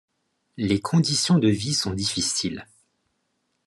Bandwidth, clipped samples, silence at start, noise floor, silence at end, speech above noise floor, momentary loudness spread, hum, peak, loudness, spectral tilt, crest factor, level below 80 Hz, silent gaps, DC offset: 12.5 kHz; under 0.1%; 0.6 s; -74 dBFS; 1.05 s; 51 dB; 10 LU; none; -8 dBFS; -23 LUFS; -4.5 dB/octave; 18 dB; -66 dBFS; none; under 0.1%